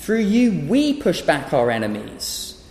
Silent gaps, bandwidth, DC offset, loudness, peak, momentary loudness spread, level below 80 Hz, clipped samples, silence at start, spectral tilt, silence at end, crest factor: none; 15 kHz; under 0.1%; -20 LUFS; -4 dBFS; 9 LU; -48 dBFS; under 0.1%; 0 s; -5 dB/octave; 0.1 s; 16 dB